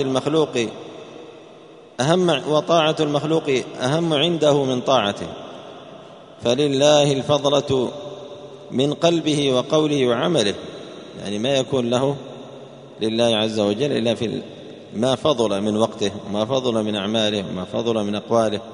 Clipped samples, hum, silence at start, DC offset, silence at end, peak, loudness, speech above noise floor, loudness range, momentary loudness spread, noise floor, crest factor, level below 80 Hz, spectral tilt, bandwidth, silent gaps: under 0.1%; none; 0 s; under 0.1%; 0 s; -2 dBFS; -20 LUFS; 24 dB; 3 LU; 19 LU; -44 dBFS; 20 dB; -60 dBFS; -5 dB/octave; 10.5 kHz; none